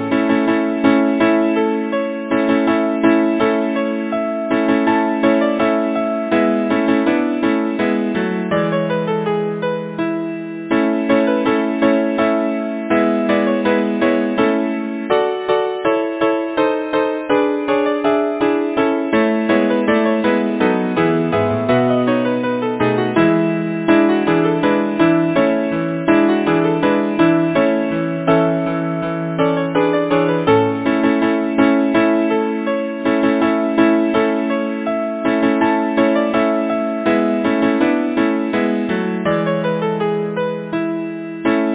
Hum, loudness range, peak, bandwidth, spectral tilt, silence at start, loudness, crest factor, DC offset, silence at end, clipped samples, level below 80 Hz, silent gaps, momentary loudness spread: none; 2 LU; 0 dBFS; 4 kHz; -10.5 dB/octave; 0 s; -17 LUFS; 16 dB; under 0.1%; 0 s; under 0.1%; -52 dBFS; none; 5 LU